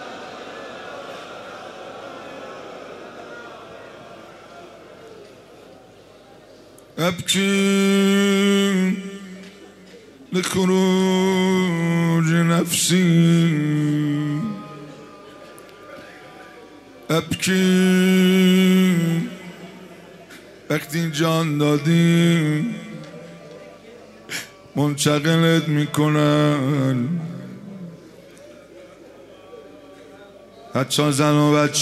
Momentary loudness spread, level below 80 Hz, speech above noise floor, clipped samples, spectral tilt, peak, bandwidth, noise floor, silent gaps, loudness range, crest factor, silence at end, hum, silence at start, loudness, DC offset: 24 LU; -62 dBFS; 29 dB; under 0.1%; -5.5 dB/octave; -4 dBFS; 15 kHz; -47 dBFS; none; 18 LU; 18 dB; 0 s; none; 0 s; -19 LUFS; under 0.1%